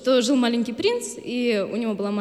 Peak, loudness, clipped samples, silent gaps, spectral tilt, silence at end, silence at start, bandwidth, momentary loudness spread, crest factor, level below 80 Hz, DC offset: -8 dBFS; -23 LUFS; under 0.1%; none; -4 dB/octave; 0 s; 0 s; 13 kHz; 7 LU; 14 dB; -66 dBFS; under 0.1%